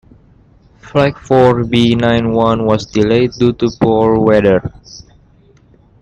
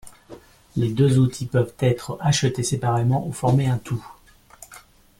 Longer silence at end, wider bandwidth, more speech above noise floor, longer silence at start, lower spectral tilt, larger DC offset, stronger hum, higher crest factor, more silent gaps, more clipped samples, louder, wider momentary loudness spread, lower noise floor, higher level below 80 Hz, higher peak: first, 1 s vs 0.4 s; second, 9 kHz vs 14 kHz; first, 35 dB vs 28 dB; first, 0.85 s vs 0.05 s; about the same, -7 dB/octave vs -6 dB/octave; neither; neither; about the same, 14 dB vs 14 dB; neither; neither; first, -12 LUFS vs -22 LUFS; second, 4 LU vs 13 LU; about the same, -47 dBFS vs -48 dBFS; first, -38 dBFS vs -50 dBFS; first, 0 dBFS vs -8 dBFS